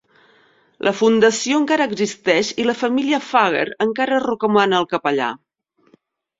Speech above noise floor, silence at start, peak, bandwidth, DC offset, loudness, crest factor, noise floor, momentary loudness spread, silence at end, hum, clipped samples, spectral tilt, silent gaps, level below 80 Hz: 42 dB; 0.85 s; -2 dBFS; 7.8 kHz; under 0.1%; -18 LUFS; 18 dB; -59 dBFS; 6 LU; 1.05 s; none; under 0.1%; -4 dB/octave; none; -62 dBFS